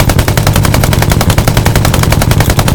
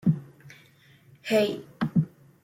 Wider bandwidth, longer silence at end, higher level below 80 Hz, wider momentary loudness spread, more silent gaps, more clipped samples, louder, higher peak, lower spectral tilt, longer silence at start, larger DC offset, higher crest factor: first, over 20 kHz vs 16 kHz; second, 0 s vs 0.35 s; first, -16 dBFS vs -62 dBFS; second, 1 LU vs 14 LU; neither; first, 3% vs under 0.1%; first, -9 LUFS vs -28 LUFS; first, 0 dBFS vs -12 dBFS; second, -5 dB/octave vs -7 dB/octave; about the same, 0 s vs 0.05 s; neither; second, 8 dB vs 18 dB